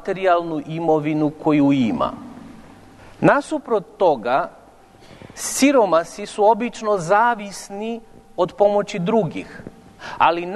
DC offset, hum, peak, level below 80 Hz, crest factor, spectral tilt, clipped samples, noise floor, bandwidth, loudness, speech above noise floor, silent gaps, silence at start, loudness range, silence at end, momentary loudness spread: under 0.1%; none; -2 dBFS; -54 dBFS; 18 dB; -5 dB/octave; under 0.1%; -47 dBFS; 12 kHz; -19 LUFS; 28 dB; none; 0 s; 3 LU; 0 s; 17 LU